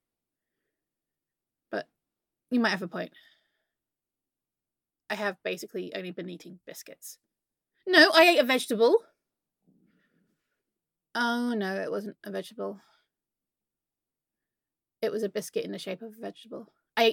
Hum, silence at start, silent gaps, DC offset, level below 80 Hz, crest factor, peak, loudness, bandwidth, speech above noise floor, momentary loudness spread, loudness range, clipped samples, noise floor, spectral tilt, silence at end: none; 1.7 s; none; under 0.1%; -84 dBFS; 24 dB; -6 dBFS; -26 LUFS; 17.5 kHz; over 62 dB; 25 LU; 14 LU; under 0.1%; under -90 dBFS; -3.5 dB/octave; 0 s